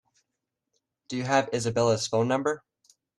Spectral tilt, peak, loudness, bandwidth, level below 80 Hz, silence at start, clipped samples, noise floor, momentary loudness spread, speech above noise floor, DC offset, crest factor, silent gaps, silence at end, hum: -4.5 dB/octave; -10 dBFS; -27 LUFS; 12 kHz; -66 dBFS; 1.1 s; under 0.1%; -84 dBFS; 10 LU; 59 dB; under 0.1%; 20 dB; none; 0.6 s; none